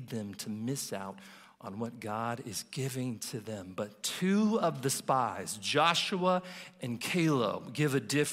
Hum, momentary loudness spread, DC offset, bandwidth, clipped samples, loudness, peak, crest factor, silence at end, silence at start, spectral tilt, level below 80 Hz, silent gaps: none; 13 LU; under 0.1%; 16 kHz; under 0.1%; -32 LUFS; -12 dBFS; 22 dB; 0 s; 0 s; -4.5 dB/octave; -76 dBFS; none